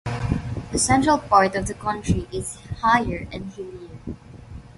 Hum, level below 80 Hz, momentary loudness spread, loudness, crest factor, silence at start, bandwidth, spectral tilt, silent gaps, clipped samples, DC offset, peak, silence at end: none; -38 dBFS; 20 LU; -22 LUFS; 20 dB; 0.05 s; 11.5 kHz; -4.5 dB/octave; none; under 0.1%; under 0.1%; -2 dBFS; 0.05 s